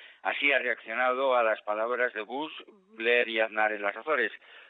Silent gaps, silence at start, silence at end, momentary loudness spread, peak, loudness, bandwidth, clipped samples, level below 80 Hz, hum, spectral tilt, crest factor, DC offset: none; 0 s; 0.05 s; 10 LU; -12 dBFS; -28 LUFS; 4.6 kHz; under 0.1%; -82 dBFS; none; -6 dB/octave; 18 dB; under 0.1%